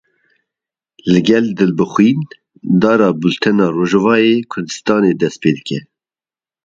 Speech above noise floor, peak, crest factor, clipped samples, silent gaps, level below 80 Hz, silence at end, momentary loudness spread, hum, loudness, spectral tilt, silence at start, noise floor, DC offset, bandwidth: over 77 dB; 0 dBFS; 14 dB; under 0.1%; none; -54 dBFS; 0.85 s; 12 LU; none; -14 LUFS; -6.5 dB/octave; 1.05 s; under -90 dBFS; under 0.1%; 7.8 kHz